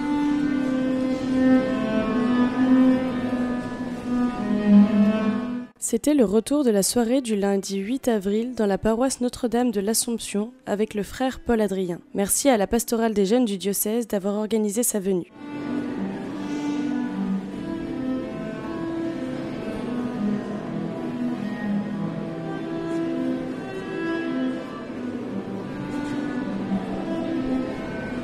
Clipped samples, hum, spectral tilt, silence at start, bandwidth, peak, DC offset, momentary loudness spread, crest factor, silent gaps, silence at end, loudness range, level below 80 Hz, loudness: under 0.1%; none; -5 dB/octave; 0 s; 16 kHz; -4 dBFS; under 0.1%; 11 LU; 18 dB; none; 0 s; 8 LU; -50 dBFS; -24 LUFS